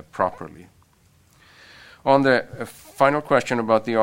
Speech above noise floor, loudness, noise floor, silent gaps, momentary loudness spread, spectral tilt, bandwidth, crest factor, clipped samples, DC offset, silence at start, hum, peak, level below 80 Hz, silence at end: 37 dB; -20 LUFS; -58 dBFS; none; 18 LU; -6 dB/octave; 16.5 kHz; 20 dB; under 0.1%; under 0.1%; 0.15 s; none; -2 dBFS; -60 dBFS; 0 s